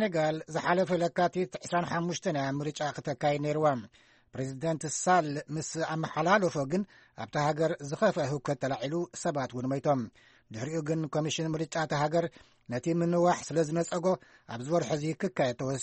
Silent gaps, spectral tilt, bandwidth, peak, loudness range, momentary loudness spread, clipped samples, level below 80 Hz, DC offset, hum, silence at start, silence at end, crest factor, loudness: none; -5.5 dB/octave; 8.4 kHz; -10 dBFS; 2 LU; 9 LU; under 0.1%; -66 dBFS; under 0.1%; none; 0 s; 0 s; 20 dB; -31 LUFS